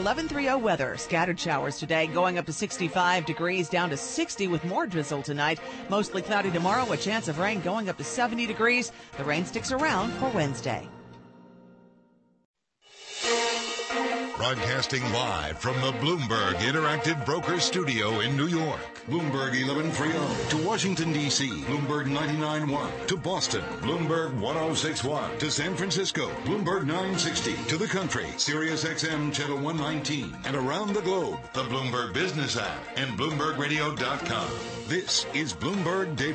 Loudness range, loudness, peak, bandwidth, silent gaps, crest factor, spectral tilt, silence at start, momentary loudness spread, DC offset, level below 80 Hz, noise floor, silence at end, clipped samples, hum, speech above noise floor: 3 LU; -28 LUFS; -12 dBFS; 8.8 kHz; 12.45-12.54 s; 16 dB; -4 dB/octave; 0 s; 5 LU; under 0.1%; -56 dBFS; -62 dBFS; 0 s; under 0.1%; none; 34 dB